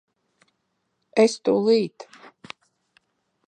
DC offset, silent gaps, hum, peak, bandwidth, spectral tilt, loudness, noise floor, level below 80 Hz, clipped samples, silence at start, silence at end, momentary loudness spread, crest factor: under 0.1%; none; none; -4 dBFS; 9.6 kHz; -5 dB/octave; -21 LUFS; -75 dBFS; -76 dBFS; under 0.1%; 1.15 s; 1.45 s; 24 LU; 22 dB